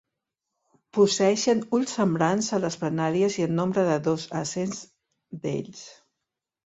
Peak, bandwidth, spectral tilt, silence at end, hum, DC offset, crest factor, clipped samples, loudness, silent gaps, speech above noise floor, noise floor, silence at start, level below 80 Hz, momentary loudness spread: -8 dBFS; 8.4 kHz; -5 dB/octave; 0.75 s; none; under 0.1%; 18 dB; under 0.1%; -25 LUFS; none; 61 dB; -85 dBFS; 0.95 s; -66 dBFS; 12 LU